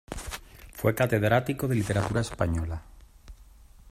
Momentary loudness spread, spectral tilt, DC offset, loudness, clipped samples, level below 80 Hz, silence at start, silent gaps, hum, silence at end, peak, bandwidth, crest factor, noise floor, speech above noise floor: 16 LU; -6 dB/octave; under 0.1%; -27 LUFS; under 0.1%; -46 dBFS; 0.1 s; none; none; 0.5 s; -10 dBFS; 16 kHz; 20 dB; -52 dBFS; 26 dB